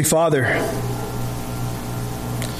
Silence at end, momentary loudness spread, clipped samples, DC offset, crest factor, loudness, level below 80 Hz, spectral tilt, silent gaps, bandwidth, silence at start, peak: 0 s; 10 LU; under 0.1%; under 0.1%; 14 dB; -22 LUFS; -36 dBFS; -4.5 dB/octave; none; 15.5 kHz; 0 s; -6 dBFS